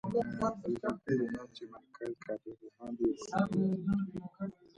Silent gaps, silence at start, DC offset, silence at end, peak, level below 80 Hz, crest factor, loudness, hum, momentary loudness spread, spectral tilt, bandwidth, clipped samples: none; 0.05 s; under 0.1%; 0.25 s; -18 dBFS; -62 dBFS; 18 dB; -36 LUFS; none; 15 LU; -7.5 dB/octave; 10.5 kHz; under 0.1%